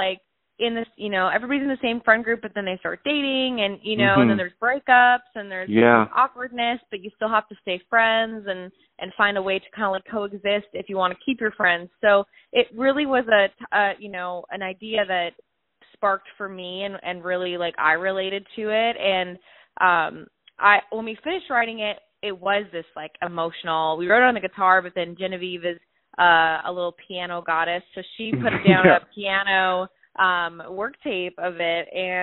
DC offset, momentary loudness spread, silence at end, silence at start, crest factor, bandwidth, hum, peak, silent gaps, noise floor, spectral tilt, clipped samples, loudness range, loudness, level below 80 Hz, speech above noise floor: under 0.1%; 14 LU; 0 s; 0 s; 22 dB; 4.2 kHz; none; 0 dBFS; none; -59 dBFS; -2 dB/octave; under 0.1%; 5 LU; -22 LUFS; -62 dBFS; 37 dB